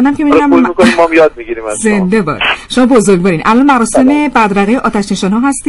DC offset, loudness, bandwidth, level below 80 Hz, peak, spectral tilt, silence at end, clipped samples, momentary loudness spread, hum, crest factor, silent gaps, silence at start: under 0.1%; -9 LUFS; 12 kHz; -36 dBFS; 0 dBFS; -5 dB/octave; 0 s; 0.4%; 6 LU; none; 8 dB; none; 0 s